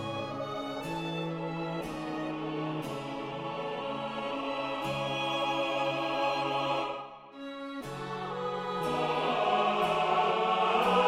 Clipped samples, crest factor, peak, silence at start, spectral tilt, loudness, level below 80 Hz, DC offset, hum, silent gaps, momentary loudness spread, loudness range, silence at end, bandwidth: under 0.1%; 18 dB; -14 dBFS; 0 s; -5 dB/octave; -32 LUFS; -62 dBFS; under 0.1%; none; none; 10 LU; 6 LU; 0 s; 16 kHz